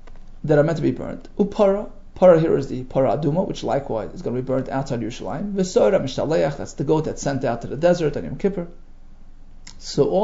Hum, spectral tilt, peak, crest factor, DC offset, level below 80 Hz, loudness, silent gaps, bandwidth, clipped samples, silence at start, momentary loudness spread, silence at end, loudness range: none; -6.5 dB/octave; -2 dBFS; 20 dB; under 0.1%; -38 dBFS; -21 LUFS; none; 7.8 kHz; under 0.1%; 0 s; 11 LU; 0 s; 4 LU